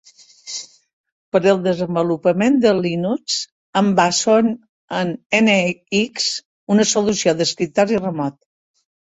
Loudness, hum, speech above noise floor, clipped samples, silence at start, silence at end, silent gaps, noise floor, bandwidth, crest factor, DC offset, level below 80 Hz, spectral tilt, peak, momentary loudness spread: -18 LUFS; none; 21 dB; under 0.1%; 0.45 s; 0.8 s; 0.93-1.04 s, 1.12-1.32 s, 3.52-3.73 s, 4.69-4.88 s, 5.26-5.30 s, 6.45-6.67 s; -38 dBFS; 8.2 kHz; 16 dB; under 0.1%; -60 dBFS; -4 dB/octave; -2 dBFS; 11 LU